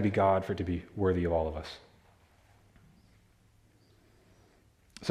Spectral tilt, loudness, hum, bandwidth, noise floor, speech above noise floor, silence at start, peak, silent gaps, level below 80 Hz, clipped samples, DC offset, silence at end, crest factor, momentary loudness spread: -7.5 dB/octave; -31 LUFS; none; 12 kHz; -64 dBFS; 35 dB; 0 s; -14 dBFS; none; -56 dBFS; under 0.1%; under 0.1%; 0 s; 20 dB; 19 LU